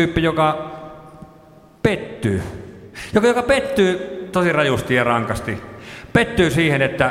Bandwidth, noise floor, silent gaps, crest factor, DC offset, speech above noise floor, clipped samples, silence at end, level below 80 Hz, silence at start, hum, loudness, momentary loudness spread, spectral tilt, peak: 16 kHz; -46 dBFS; none; 18 dB; under 0.1%; 29 dB; under 0.1%; 0 s; -42 dBFS; 0 s; none; -19 LUFS; 18 LU; -6 dB/octave; -2 dBFS